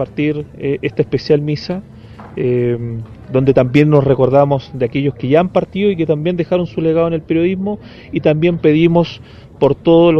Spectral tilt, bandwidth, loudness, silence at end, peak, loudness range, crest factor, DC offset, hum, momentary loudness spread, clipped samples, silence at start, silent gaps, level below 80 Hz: -9 dB/octave; 6.6 kHz; -15 LUFS; 0 s; 0 dBFS; 3 LU; 14 dB; under 0.1%; none; 11 LU; under 0.1%; 0 s; none; -42 dBFS